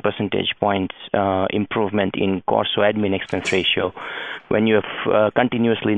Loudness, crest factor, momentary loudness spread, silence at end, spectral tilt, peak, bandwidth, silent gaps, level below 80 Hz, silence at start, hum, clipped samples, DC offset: -20 LUFS; 20 dB; 6 LU; 0 s; -6 dB/octave; -2 dBFS; 10 kHz; none; -50 dBFS; 0.05 s; none; under 0.1%; under 0.1%